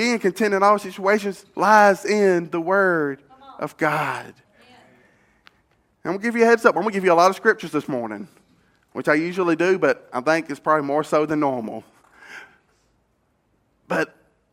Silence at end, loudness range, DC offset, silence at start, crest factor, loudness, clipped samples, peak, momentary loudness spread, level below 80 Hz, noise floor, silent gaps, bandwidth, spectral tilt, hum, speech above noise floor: 0.5 s; 8 LU; under 0.1%; 0 s; 22 dB; -20 LUFS; under 0.1%; 0 dBFS; 17 LU; -70 dBFS; -67 dBFS; none; 16.5 kHz; -5 dB/octave; none; 47 dB